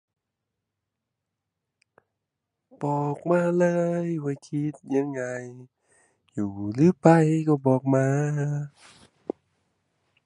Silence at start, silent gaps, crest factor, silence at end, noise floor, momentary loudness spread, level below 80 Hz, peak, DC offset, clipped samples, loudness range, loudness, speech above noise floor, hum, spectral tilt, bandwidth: 2.8 s; none; 24 dB; 1.6 s; -84 dBFS; 19 LU; -66 dBFS; -2 dBFS; under 0.1%; under 0.1%; 7 LU; -24 LUFS; 60 dB; none; -8.5 dB/octave; 11 kHz